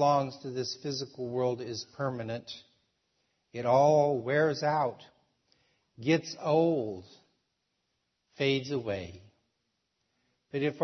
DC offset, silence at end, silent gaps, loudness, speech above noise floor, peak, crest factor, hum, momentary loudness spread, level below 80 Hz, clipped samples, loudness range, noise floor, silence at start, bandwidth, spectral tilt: under 0.1%; 0 s; none; -30 LUFS; 51 dB; -12 dBFS; 18 dB; none; 14 LU; -74 dBFS; under 0.1%; 8 LU; -80 dBFS; 0 s; 6.4 kHz; -5.5 dB/octave